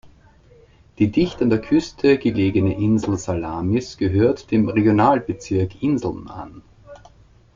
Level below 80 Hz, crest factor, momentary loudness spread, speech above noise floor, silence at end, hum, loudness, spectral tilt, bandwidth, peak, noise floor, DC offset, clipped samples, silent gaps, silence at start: -48 dBFS; 16 dB; 7 LU; 32 dB; 0.6 s; none; -20 LUFS; -7.5 dB/octave; 7.6 kHz; -4 dBFS; -50 dBFS; under 0.1%; under 0.1%; none; 0.05 s